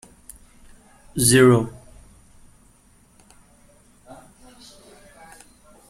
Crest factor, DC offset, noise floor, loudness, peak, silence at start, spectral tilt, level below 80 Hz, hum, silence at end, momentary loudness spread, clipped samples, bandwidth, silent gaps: 22 dB; under 0.1%; -55 dBFS; -17 LUFS; -2 dBFS; 1.15 s; -4.5 dB/octave; -52 dBFS; none; 4.2 s; 21 LU; under 0.1%; 16 kHz; none